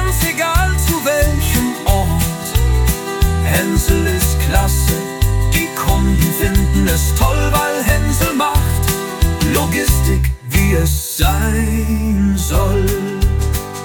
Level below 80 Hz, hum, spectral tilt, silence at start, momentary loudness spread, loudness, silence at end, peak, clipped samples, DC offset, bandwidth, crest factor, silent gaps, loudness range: -18 dBFS; none; -5 dB/octave; 0 s; 3 LU; -15 LUFS; 0 s; 0 dBFS; under 0.1%; under 0.1%; 19 kHz; 14 dB; none; 1 LU